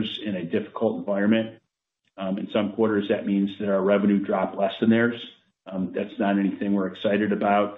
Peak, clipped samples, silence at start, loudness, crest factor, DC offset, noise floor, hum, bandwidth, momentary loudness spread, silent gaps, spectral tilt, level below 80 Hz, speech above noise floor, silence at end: -8 dBFS; under 0.1%; 0 s; -24 LUFS; 16 dB; under 0.1%; -76 dBFS; none; 4 kHz; 9 LU; none; -9.5 dB/octave; -70 dBFS; 52 dB; 0 s